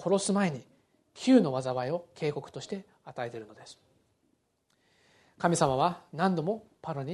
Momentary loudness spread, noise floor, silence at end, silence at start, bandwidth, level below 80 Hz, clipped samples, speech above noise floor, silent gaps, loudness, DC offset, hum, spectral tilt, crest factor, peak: 18 LU; -74 dBFS; 0 s; 0 s; 11.5 kHz; -68 dBFS; under 0.1%; 45 dB; none; -30 LUFS; under 0.1%; none; -5.5 dB/octave; 22 dB; -10 dBFS